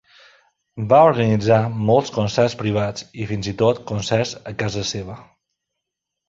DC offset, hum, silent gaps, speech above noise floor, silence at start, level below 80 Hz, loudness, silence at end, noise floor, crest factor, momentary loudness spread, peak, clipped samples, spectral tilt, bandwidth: under 0.1%; none; none; 63 dB; 0.75 s; -48 dBFS; -19 LUFS; 1.05 s; -82 dBFS; 18 dB; 14 LU; -2 dBFS; under 0.1%; -6 dB/octave; 7.8 kHz